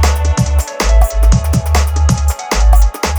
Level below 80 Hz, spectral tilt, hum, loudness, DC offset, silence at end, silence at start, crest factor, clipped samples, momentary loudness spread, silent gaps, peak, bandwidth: -12 dBFS; -5 dB/octave; none; -13 LUFS; under 0.1%; 0 s; 0 s; 10 dB; under 0.1%; 4 LU; none; 0 dBFS; over 20 kHz